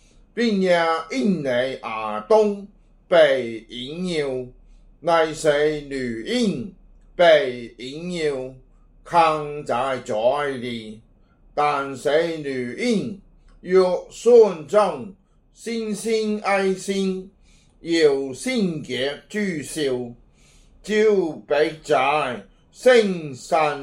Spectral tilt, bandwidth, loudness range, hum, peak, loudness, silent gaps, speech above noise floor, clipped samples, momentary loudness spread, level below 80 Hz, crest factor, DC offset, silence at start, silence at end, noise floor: -5 dB/octave; 14.5 kHz; 4 LU; none; -2 dBFS; -21 LUFS; none; 33 dB; under 0.1%; 16 LU; -54 dBFS; 18 dB; under 0.1%; 0.35 s; 0 s; -54 dBFS